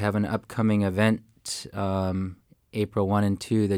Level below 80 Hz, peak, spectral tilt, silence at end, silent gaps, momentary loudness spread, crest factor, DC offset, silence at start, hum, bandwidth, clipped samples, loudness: -58 dBFS; -10 dBFS; -6.5 dB/octave; 0 s; none; 10 LU; 16 dB; under 0.1%; 0 s; none; 15.5 kHz; under 0.1%; -27 LUFS